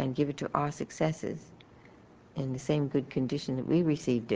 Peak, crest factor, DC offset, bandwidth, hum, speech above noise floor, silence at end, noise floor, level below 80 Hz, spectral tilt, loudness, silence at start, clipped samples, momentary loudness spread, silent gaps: -10 dBFS; 22 dB; under 0.1%; 9.6 kHz; none; 25 dB; 0 s; -56 dBFS; -62 dBFS; -7 dB/octave; -31 LUFS; 0 s; under 0.1%; 10 LU; none